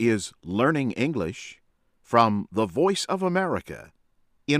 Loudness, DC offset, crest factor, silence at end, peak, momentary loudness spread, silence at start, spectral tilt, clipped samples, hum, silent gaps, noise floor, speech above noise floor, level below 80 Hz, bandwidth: -25 LUFS; under 0.1%; 20 dB; 0 s; -4 dBFS; 18 LU; 0 s; -5.5 dB/octave; under 0.1%; none; none; -65 dBFS; 40 dB; -60 dBFS; 15.5 kHz